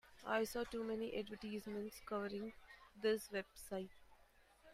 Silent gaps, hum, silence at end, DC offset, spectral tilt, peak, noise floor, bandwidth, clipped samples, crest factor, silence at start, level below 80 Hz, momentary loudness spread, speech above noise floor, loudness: none; none; 0 s; under 0.1%; -4.5 dB/octave; -26 dBFS; -70 dBFS; 15.5 kHz; under 0.1%; 20 dB; 0.05 s; -70 dBFS; 10 LU; 26 dB; -44 LUFS